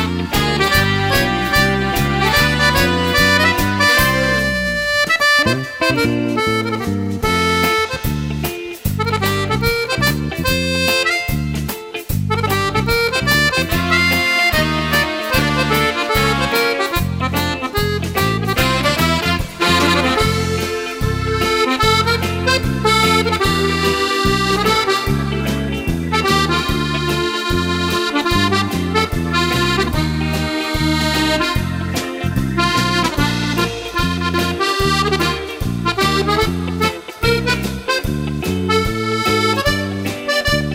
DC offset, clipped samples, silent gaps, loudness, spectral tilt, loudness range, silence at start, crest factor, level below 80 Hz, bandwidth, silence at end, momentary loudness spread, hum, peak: under 0.1%; under 0.1%; none; -16 LUFS; -4.5 dB/octave; 4 LU; 0 s; 16 dB; -30 dBFS; 16.5 kHz; 0 s; 7 LU; none; 0 dBFS